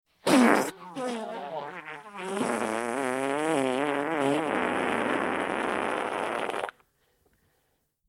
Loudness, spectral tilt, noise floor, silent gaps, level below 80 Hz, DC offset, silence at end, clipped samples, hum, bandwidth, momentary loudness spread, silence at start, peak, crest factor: -28 LUFS; -4 dB/octave; -74 dBFS; none; -68 dBFS; under 0.1%; 1.4 s; under 0.1%; none; 16.5 kHz; 13 LU; 0.25 s; -4 dBFS; 24 dB